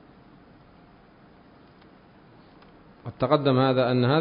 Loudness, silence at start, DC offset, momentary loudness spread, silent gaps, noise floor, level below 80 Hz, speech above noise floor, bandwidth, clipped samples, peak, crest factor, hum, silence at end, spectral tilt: -22 LUFS; 3.05 s; under 0.1%; 20 LU; none; -53 dBFS; -60 dBFS; 32 dB; 5.2 kHz; under 0.1%; -6 dBFS; 22 dB; none; 0 s; -11 dB/octave